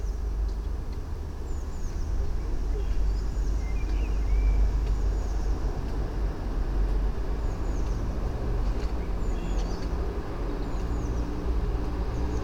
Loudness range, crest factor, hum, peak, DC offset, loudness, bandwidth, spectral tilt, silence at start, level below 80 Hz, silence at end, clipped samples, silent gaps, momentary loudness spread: 3 LU; 12 dB; none; -14 dBFS; under 0.1%; -32 LUFS; 7.6 kHz; -7 dB/octave; 0 s; -28 dBFS; 0 s; under 0.1%; none; 6 LU